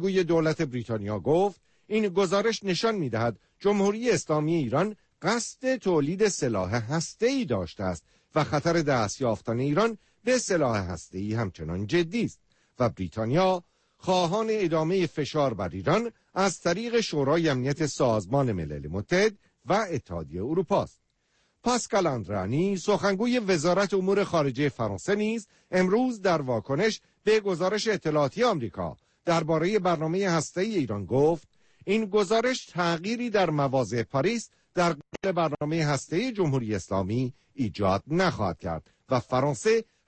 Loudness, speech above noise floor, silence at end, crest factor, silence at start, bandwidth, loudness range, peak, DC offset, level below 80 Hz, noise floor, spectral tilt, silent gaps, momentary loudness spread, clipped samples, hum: -27 LUFS; 45 dB; 0.25 s; 14 dB; 0 s; 8.8 kHz; 2 LU; -12 dBFS; under 0.1%; -56 dBFS; -71 dBFS; -5.5 dB/octave; none; 8 LU; under 0.1%; none